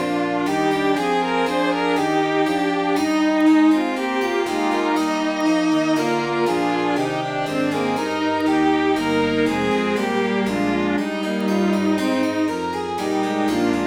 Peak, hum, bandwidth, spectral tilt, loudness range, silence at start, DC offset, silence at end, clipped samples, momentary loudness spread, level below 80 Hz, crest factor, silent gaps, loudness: -6 dBFS; none; 15 kHz; -5.5 dB/octave; 2 LU; 0 s; under 0.1%; 0 s; under 0.1%; 4 LU; -54 dBFS; 12 dB; none; -20 LUFS